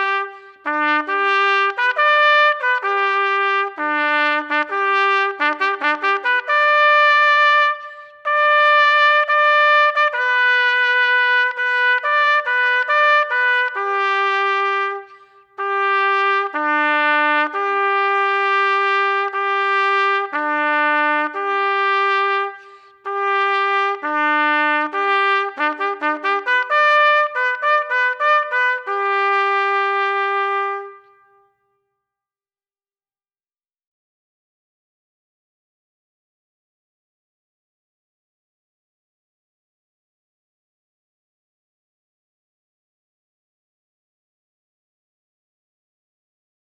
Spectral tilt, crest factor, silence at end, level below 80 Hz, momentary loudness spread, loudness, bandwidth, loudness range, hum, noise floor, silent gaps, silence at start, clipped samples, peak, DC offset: -0.5 dB/octave; 16 dB; 15.75 s; -86 dBFS; 8 LU; -16 LUFS; 8 kHz; 5 LU; none; under -90 dBFS; none; 0 s; under 0.1%; -4 dBFS; under 0.1%